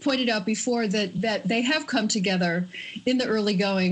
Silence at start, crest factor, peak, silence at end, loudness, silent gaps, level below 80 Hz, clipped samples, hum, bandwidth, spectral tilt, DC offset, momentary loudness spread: 0 s; 14 dB; -12 dBFS; 0 s; -25 LUFS; none; -66 dBFS; under 0.1%; none; 9.2 kHz; -4.5 dB/octave; under 0.1%; 3 LU